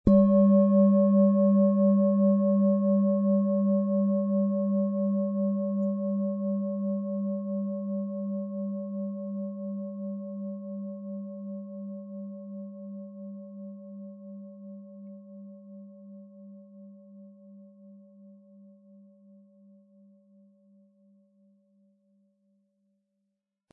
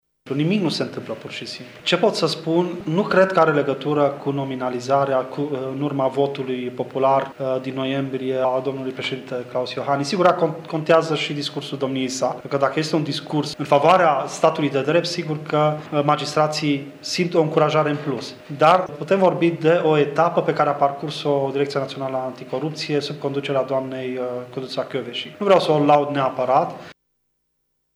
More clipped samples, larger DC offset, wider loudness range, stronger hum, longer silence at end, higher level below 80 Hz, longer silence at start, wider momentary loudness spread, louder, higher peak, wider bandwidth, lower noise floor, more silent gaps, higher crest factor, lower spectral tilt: neither; neither; first, 24 LU vs 4 LU; neither; first, 5.4 s vs 1.05 s; first, -56 dBFS vs -70 dBFS; second, 0.05 s vs 0.25 s; first, 24 LU vs 10 LU; second, -26 LUFS vs -21 LUFS; second, -6 dBFS vs -2 dBFS; second, 1.8 kHz vs 13.5 kHz; first, -82 dBFS vs -72 dBFS; neither; about the same, 22 dB vs 18 dB; first, -14 dB/octave vs -5.5 dB/octave